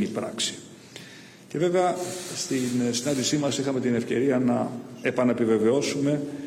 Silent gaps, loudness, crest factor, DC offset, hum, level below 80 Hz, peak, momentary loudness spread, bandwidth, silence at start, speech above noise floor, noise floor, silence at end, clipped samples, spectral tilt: none; -25 LUFS; 14 dB; under 0.1%; none; -68 dBFS; -12 dBFS; 14 LU; 16 kHz; 0 s; 21 dB; -46 dBFS; 0 s; under 0.1%; -4.5 dB/octave